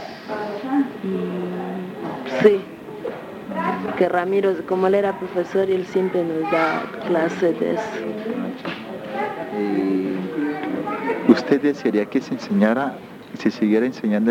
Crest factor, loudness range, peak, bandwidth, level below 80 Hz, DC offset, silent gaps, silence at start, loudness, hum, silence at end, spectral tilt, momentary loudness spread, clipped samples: 22 dB; 4 LU; 0 dBFS; 16 kHz; -64 dBFS; under 0.1%; none; 0 s; -22 LUFS; none; 0 s; -7 dB/octave; 12 LU; under 0.1%